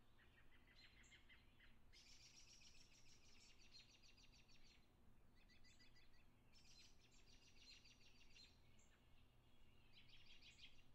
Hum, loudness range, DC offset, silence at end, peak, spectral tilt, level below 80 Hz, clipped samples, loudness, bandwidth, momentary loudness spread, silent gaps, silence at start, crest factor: none; 1 LU; under 0.1%; 0 s; -52 dBFS; -2 dB/octave; -74 dBFS; under 0.1%; -68 LUFS; 8.8 kHz; 3 LU; none; 0 s; 16 dB